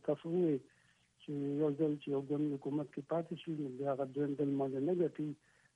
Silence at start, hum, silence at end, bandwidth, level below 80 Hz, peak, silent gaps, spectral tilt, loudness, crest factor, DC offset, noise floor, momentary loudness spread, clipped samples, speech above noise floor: 0.05 s; none; 0.4 s; 9 kHz; -82 dBFS; -22 dBFS; none; -9 dB/octave; -37 LUFS; 14 dB; under 0.1%; -67 dBFS; 8 LU; under 0.1%; 31 dB